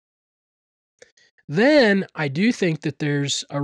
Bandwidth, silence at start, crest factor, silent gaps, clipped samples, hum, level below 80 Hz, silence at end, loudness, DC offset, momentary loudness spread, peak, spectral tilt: 10.5 kHz; 1.5 s; 14 dB; none; under 0.1%; none; -68 dBFS; 0 s; -20 LUFS; under 0.1%; 10 LU; -8 dBFS; -5 dB/octave